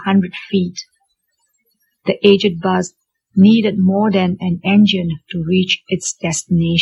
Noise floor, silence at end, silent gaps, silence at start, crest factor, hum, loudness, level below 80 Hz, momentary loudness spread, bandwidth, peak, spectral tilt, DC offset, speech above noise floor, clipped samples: -67 dBFS; 0 s; none; 0 s; 14 dB; none; -15 LUFS; -52 dBFS; 11 LU; 11.5 kHz; 0 dBFS; -5.5 dB/octave; under 0.1%; 52 dB; under 0.1%